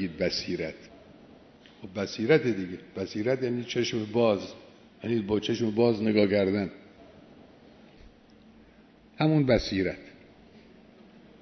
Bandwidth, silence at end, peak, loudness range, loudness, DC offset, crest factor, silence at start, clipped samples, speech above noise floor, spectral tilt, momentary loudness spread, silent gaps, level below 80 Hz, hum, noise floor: 6.4 kHz; 0.85 s; -8 dBFS; 4 LU; -27 LUFS; under 0.1%; 22 dB; 0 s; under 0.1%; 29 dB; -6.5 dB/octave; 14 LU; none; -56 dBFS; none; -56 dBFS